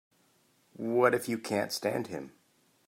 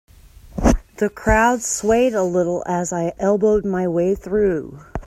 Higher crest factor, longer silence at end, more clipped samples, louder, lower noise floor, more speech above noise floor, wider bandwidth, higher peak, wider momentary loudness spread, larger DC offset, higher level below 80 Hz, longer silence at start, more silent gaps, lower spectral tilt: about the same, 22 dB vs 18 dB; first, 0.6 s vs 0 s; neither; second, -31 LUFS vs -19 LUFS; first, -69 dBFS vs -42 dBFS; first, 39 dB vs 24 dB; about the same, 16 kHz vs 15 kHz; second, -10 dBFS vs -2 dBFS; first, 15 LU vs 7 LU; neither; second, -76 dBFS vs -32 dBFS; first, 0.8 s vs 0.45 s; neither; about the same, -4.5 dB/octave vs -5.5 dB/octave